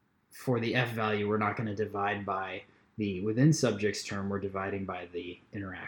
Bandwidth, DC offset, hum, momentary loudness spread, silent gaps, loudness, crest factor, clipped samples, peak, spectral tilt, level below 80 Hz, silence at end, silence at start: 18.5 kHz; under 0.1%; none; 14 LU; none; -32 LUFS; 20 dB; under 0.1%; -12 dBFS; -5.5 dB/octave; -70 dBFS; 0 s; 0.35 s